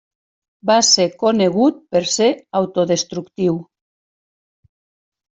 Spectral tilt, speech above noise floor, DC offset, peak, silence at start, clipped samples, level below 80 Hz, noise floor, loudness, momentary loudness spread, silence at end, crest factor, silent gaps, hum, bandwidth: -3.5 dB/octave; over 73 dB; under 0.1%; -2 dBFS; 0.65 s; under 0.1%; -62 dBFS; under -90 dBFS; -17 LUFS; 9 LU; 1.7 s; 16 dB; none; none; 8.2 kHz